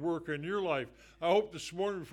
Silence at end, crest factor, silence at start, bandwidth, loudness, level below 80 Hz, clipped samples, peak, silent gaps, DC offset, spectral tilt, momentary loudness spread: 0 s; 18 dB; 0 s; 12.5 kHz; -34 LUFS; -66 dBFS; under 0.1%; -16 dBFS; none; under 0.1%; -5 dB/octave; 8 LU